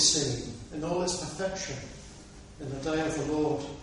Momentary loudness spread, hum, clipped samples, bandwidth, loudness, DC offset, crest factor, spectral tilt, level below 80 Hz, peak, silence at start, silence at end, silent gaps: 17 LU; none; under 0.1%; 11.5 kHz; -31 LUFS; under 0.1%; 22 dB; -3 dB/octave; -50 dBFS; -10 dBFS; 0 s; 0 s; none